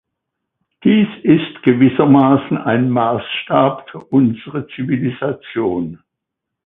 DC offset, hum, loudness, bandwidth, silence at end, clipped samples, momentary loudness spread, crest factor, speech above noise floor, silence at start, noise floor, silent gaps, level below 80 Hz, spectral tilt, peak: under 0.1%; none; -15 LUFS; 3.9 kHz; 0.7 s; under 0.1%; 12 LU; 16 dB; 65 dB; 0.85 s; -80 dBFS; none; -54 dBFS; -10.5 dB/octave; 0 dBFS